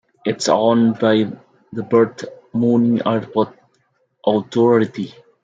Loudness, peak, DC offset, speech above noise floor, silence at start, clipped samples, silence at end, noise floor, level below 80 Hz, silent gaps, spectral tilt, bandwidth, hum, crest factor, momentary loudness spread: -18 LUFS; -2 dBFS; under 0.1%; 47 dB; 0.25 s; under 0.1%; 0.35 s; -64 dBFS; -64 dBFS; none; -6 dB/octave; 9.2 kHz; none; 16 dB; 15 LU